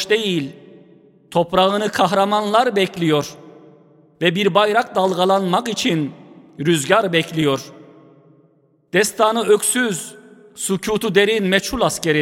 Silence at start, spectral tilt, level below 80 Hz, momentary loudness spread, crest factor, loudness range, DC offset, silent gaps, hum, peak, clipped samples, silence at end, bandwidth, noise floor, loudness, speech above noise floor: 0 s; -4 dB/octave; -52 dBFS; 8 LU; 18 dB; 3 LU; under 0.1%; none; none; 0 dBFS; under 0.1%; 0 s; 16.5 kHz; -57 dBFS; -18 LUFS; 40 dB